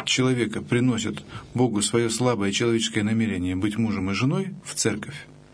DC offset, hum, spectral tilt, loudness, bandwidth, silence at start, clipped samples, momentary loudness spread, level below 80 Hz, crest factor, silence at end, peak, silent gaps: under 0.1%; none; -4.5 dB/octave; -24 LUFS; 11 kHz; 0 s; under 0.1%; 9 LU; -56 dBFS; 18 dB; 0.15 s; -6 dBFS; none